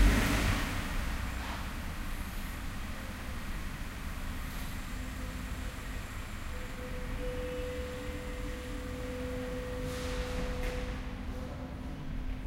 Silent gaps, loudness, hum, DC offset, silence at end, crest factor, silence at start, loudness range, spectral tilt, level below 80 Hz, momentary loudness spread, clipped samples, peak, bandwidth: none; -38 LUFS; none; under 0.1%; 0 s; 22 dB; 0 s; 3 LU; -5 dB/octave; -38 dBFS; 6 LU; under 0.1%; -14 dBFS; 16 kHz